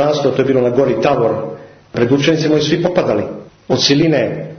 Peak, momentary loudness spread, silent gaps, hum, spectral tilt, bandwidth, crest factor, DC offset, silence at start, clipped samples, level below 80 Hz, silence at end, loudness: 0 dBFS; 13 LU; none; none; -5.5 dB/octave; 6.6 kHz; 14 dB; under 0.1%; 0 s; under 0.1%; -48 dBFS; 0 s; -14 LUFS